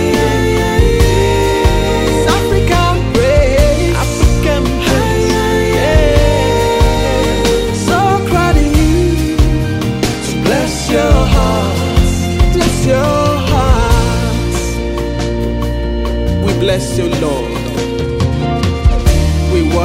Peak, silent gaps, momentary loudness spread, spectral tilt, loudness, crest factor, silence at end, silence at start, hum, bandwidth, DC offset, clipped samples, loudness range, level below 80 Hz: 0 dBFS; none; 6 LU; -5.5 dB/octave; -13 LUFS; 12 dB; 0 s; 0 s; none; 16.5 kHz; under 0.1%; under 0.1%; 4 LU; -16 dBFS